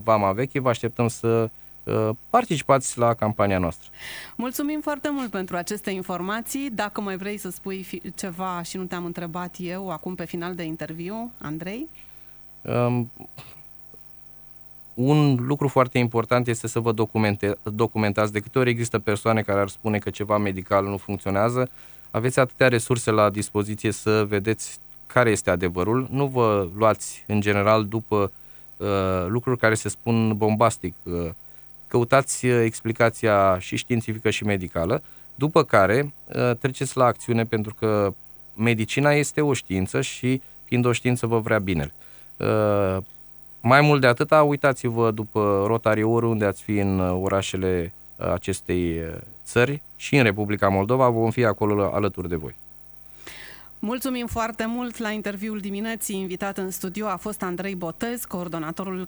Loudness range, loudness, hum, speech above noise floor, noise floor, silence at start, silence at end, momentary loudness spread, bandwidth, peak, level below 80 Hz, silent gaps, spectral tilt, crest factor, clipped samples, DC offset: 8 LU; -23 LUFS; none; 22 dB; -45 dBFS; 0 s; 0 s; 15 LU; over 20 kHz; -4 dBFS; -52 dBFS; none; -6 dB/octave; 20 dB; under 0.1%; under 0.1%